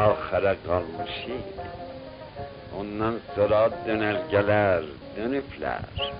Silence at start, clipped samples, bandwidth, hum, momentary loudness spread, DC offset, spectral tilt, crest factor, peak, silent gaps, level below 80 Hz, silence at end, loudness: 0 s; under 0.1%; 5.4 kHz; none; 17 LU; under 0.1%; -4 dB/octave; 18 dB; -8 dBFS; none; -50 dBFS; 0 s; -26 LUFS